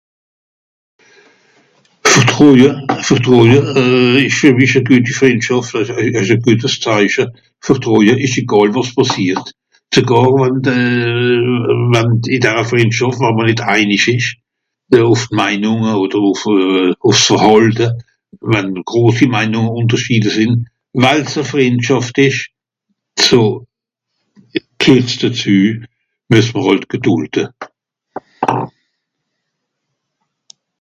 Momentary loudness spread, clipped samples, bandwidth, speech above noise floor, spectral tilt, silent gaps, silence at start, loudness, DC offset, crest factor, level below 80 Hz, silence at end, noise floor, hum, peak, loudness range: 10 LU; 0.5%; 11 kHz; 64 dB; -5 dB/octave; none; 2.05 s; -12 LUFS; under 0.1%; 12 dB; -50 dBFS; 2.1 s; -75 dBFS; none; 0 dBFS; 5 LU